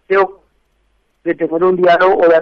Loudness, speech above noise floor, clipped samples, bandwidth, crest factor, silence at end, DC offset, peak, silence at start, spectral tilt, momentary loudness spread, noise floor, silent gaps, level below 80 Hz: -13 LUFS; 49 dB; under 0.1%; 6.2 kHz; 12 dB; 0 s; under 0.1%; -2 dBFS; 0.1 s; -7.5 dB/octave; 11 LU; -60 dBFS; none; -52 dBFS